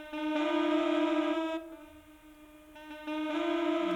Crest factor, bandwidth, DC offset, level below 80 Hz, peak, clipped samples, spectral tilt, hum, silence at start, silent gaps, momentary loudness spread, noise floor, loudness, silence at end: 14 dB; 12 kHz; under 0.1%; -66 dBFS; -18 dBFS; under 0.1%; -4.5 dB/octave; none; 0 s; none; 20 LU; -55 dBFS; -31 LUFS; 0 s